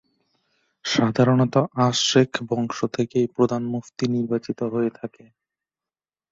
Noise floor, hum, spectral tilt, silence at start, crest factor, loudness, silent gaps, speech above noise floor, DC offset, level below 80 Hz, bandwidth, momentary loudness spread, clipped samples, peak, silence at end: under -90 dBFS; none; -5.5 dB/octave; 0.85 s; 20 dB; -22 LUFS; none; over 68 dB; under 0.1%; -60 dBFS; 7.8 kHz; 9 LU; under 0.1%; -4 dBFS; 1.25 s